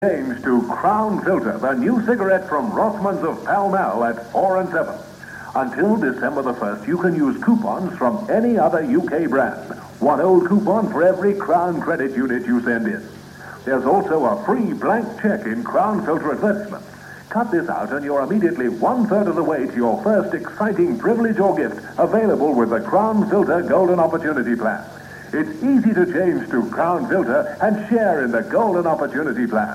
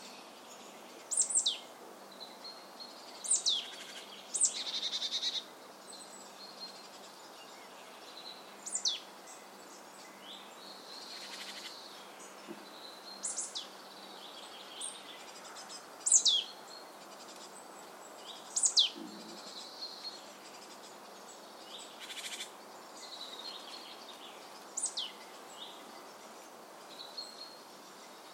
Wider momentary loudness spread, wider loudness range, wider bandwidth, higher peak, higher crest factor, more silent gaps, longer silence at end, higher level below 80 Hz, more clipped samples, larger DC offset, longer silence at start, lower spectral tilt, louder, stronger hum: second, 7 LU vs 21 LU; second, 3 LU vs 13 LU; second, 14.5 kHz vs 16.5 kHz; first, -4 dBFS vs -12 dBFS; second, 16 dB vs 28 dB; neither; about the same, 0 s vs 0 s; first, -58 dBFS vs under -90 dBFS; neither; neither; about the same, 0 s vs 0 s; first, -8 dB/octave vs 1.5 dB/octave; first, -19 LUFS vs -35 LUFS; neither